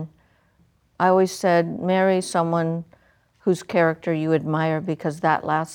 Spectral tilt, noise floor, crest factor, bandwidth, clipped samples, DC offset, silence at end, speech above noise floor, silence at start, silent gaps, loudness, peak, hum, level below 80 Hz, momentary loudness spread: -6 dB/octave; -61 dBFS; 18 dB; 17 kHz; under 0.1%; under 0.1%; 0 s; 40 dB; 0 s; none; -22 LUFS; -4 dBFS; none; -64 dBFS; 7 LU